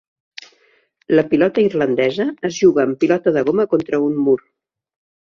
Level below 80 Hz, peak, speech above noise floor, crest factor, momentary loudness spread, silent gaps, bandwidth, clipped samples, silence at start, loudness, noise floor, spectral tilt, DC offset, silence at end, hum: -60 dBFS; -2 dBFS; 42 dB; 16 dB; 5 LU; none; 7.2 kHz; under 0.1%; 1.1 s; -17 LUFS; -58 dBFS; -6 dB/octave; under 0.1%; 1 s; none